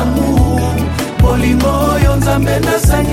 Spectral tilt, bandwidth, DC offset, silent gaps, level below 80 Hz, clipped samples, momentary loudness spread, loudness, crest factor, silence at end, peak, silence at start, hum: -6 dB/octave; 17 kHz; under 0.1%; none; -18 dBFS; under 0.1%; 3 LU; -13 LUFS; 10 dB; 0 s; 0 dBFS; 0 s; none